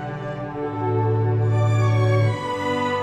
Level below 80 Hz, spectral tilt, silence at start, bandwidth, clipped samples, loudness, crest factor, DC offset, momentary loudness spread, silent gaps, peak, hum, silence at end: -52 dBFS; -7.5 dB/octave; 0 s; 8.4 kHz; under 0.1%; -22 LUFS; 12 dB; under 0.1%; 10 LU; none; -8 dBFS; none; 0 s